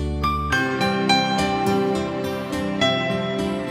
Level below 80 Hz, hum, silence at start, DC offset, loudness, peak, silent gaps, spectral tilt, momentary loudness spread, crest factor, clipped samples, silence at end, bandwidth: -38 dBFS; none; 0 s; under 0.1%; -21 LUFS; -4 dBFS; none; -5 dB/octave; 7 LU; 18 dB; under 0.1%; 0 s; 16 kHz